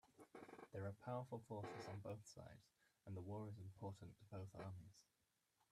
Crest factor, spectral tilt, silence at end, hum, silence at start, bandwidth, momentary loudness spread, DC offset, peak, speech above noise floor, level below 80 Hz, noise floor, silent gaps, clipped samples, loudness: 18 dB; -7 dB/octave; 0.7 s; none; 0.05 s; 13.5 kHz; 12 LU; under 0.1%; -38 dBFS; 33 dB; -82 dBFS; -87 dBFS; none; under 0.1%; -55 LUFS